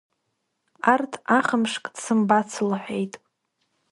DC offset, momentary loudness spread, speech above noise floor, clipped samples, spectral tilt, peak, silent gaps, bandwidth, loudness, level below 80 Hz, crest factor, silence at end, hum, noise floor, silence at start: under 0.1%; 10 LU; 53 dB; under 0.1%; -4.5 dB/octave; -2 dBFS; none; 11.5 kHz; -23 LUFS; -72 dBFS; 22 dB; 0.75 s; none; -76 dBFS; 0.85 s